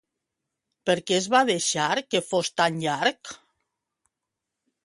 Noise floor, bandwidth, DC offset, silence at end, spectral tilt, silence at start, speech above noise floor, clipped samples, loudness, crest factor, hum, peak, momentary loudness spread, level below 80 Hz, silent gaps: -85 dBFS; 11.5 kHz; under 0.1%; 1.5 s; -3 dB/octave; 0.85 s; 61 dB; under 0.1%; -24 LUFS; 20 dB; none; -6 dBFS; 7 LU; -72 dBFS; none